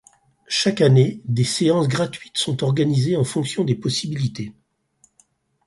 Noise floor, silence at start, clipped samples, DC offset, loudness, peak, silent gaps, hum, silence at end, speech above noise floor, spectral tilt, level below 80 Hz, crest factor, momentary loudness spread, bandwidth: -61 dBFS; 0.5 s; under 0.1%; under 0.1%; -20 LUFS; -4 dBFS; none; none; 1.15 s; 42 dB; -5.5 dB/octave; -56 dBFS; 16 dB; 9 LU; 11.5 kHz